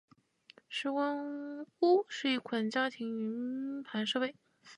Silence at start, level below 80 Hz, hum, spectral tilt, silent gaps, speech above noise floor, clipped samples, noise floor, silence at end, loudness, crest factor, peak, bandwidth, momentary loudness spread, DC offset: 0.7 s; -88 dBFS; none; -4.5 dB/octave; none; 29 dB; under 0.1%; -63 dBFS; 0 s; -34 LUFS; 18 dB; -16 dBFS; 11 kHz; 11 LU; under 0.1%